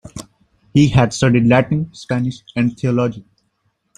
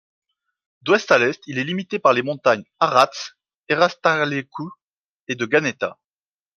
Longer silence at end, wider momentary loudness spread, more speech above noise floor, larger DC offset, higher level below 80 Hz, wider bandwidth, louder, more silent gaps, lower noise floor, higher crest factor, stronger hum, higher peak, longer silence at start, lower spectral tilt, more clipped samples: about the same, 0.75 s vs 0.65 s; second, 11 LU vs 15 LU; second, 51 dB vs over 70 dB; neither; first, -42 dBFS vs -68 dBFS; second, 10.5 kHz vs 12.5 kHz; first, -16 LUFS vs -20 LUFS; second, none vs 3.63-3.67 s, 4.84-5.27 s; second, -67 dBFS vs under -90 dBFS; second, 16 dB vs 22 dB; neither; about the same, -2 dBFS vs 0 dBFS; second, 0.05 s vs 0.85 s; first, -6.5 dB/octave vs -4.5 dB/octave; neither